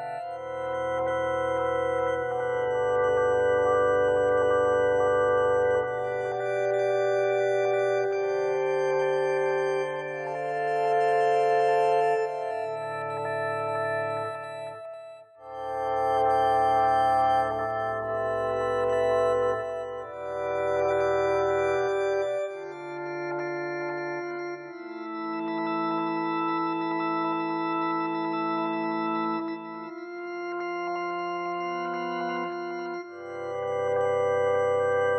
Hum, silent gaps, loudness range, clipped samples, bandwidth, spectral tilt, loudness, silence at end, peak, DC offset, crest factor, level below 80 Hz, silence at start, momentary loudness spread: none; none; 7 LU; under 0.1%; 11 kHz; -6 dB/octave; -27 LUFS; 0 s; -12 dBFS; under 0.1%; 14 dB; -60 dBFS; 0 s; 12 LU